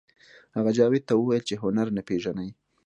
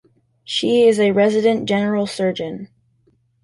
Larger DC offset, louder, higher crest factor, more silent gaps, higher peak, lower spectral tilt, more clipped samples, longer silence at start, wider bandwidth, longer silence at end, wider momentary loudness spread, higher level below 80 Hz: neither; second, -26 LUFS vs -17 LUFS; about the same, 18 dB vs 14 dB; neither; second, -8 dBFS vs -4 dBFS; about the same, -6.5 dB/octave vs -5.5 dB/octave; neither; about the same, 0.55 s vs 0.5 s; second, 9.8 kHz vs 11.5 kHz; second, 0.35 s vs 0.8 s; about the same, 13 LU vs 12 LU; about the same, -62 dBFS vs -60 dBFS